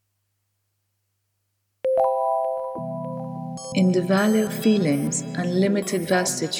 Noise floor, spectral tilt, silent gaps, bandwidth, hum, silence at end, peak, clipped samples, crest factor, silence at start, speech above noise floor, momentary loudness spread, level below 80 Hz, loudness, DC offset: -74 dBFS; -5 dB/octave; none; 19 kHz; 50 Hz at -55 dBFS; 0 s; -8 dBFS; under 0.1%; 16 dB; 1.85 s; 53 dB; 11 LU; -66 dBFS; -23 LUFS; under 0.1%